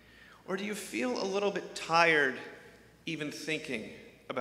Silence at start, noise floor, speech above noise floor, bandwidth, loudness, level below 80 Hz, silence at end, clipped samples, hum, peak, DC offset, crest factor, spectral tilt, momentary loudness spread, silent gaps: 0.15 s; -56 dBFS; 24 dB; 16 kHz; -31 LUFS; -72 dBFS; 0 s; under 0.1%; none; -10 dBFS; under 0.1%; 24 dB; -3.5 dB/octave; 22 LU; none